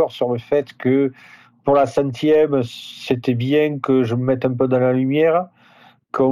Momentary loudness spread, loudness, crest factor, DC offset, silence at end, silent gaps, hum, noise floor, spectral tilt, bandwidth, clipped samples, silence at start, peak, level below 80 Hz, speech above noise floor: 8 LU; -19 LUFS; 12 dB; under 0.1%; 0 s; none; none; -51 dBFS; -7.5 dB/octave; 13.5 kHz; under 0.1%; 0 s; -6 dBFS; -60 dBFS; 33 dB